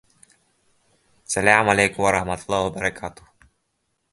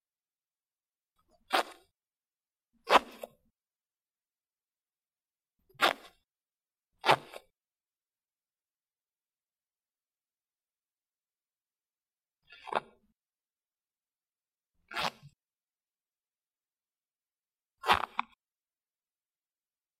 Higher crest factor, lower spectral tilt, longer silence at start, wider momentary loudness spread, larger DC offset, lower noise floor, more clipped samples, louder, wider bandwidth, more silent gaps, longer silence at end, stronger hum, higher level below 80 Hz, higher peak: second, 24 dB vs 32 dB; about the same, -3.5 dB/octave vs -2.5 dB/octave; second, 1.3 s vs 1.5 s; second, 11 LU vs 24 LU; neither; second, -73 dBFS vs under -90 dBFS; neither; first, -20 LUFS vs -31 LUFS; second, 12 kHz vs 15.5 kHz; neither; second, 1 s vs 1.8 s; neither; first, -50 dBFS vs -72 dBFS; first, 0 dBFS vs -6 dBFS